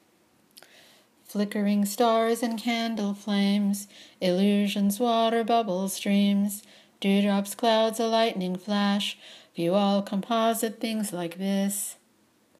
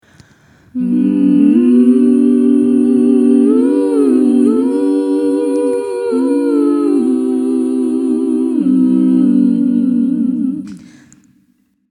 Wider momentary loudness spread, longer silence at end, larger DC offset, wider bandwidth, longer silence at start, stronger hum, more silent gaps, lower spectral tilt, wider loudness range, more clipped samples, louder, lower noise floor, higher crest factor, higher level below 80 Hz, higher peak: about the same, 8 LU vs 6 LU; second, 0.65 s vs 1.1 s; neither; first, 15.5 kHz vs 11 kHz; first, 1.3 s vs 0.75 s; neither; neither; second, -5 dB/octave vs -8.5 dB/octave; about the same, 3 LU vs 4 LU; neither; second, -26 LUFS vs -12 LUFS; first, -64 dBFS vs -57 dBFS; about the same, 16 dB vs 12 dB; second, -80 dBFS vs -62 dBFS; second, -10 dBFS vs 0 dBFS